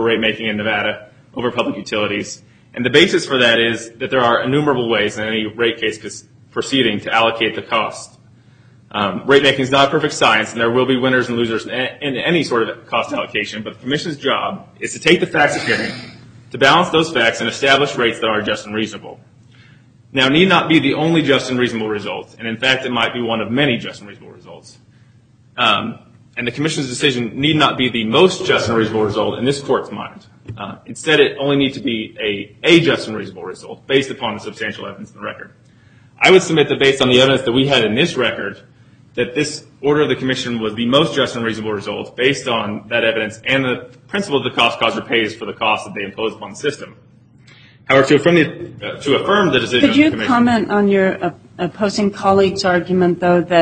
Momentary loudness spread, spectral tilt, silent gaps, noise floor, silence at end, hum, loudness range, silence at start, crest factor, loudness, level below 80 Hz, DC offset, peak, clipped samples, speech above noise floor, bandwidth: 14 LU; -4.5 dB/octave; none; -49 dBFS; 0 s; none; 5 LU; 0 s; 16 dB; -16 LUFS; -52 dBFS; under 0.1%; 0 dBFS; under 0.1%; 33 dB; 9.6 kHz